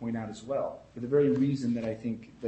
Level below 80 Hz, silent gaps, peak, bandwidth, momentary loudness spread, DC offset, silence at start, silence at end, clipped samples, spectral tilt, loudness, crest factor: -64 dBFS; none; -14 dBFS; 8.4 kHz; 12 LU; under 0.1%; 0 s; 0 s; under 0.1%; -8 dB/octave; -30 LUFS; 16 dB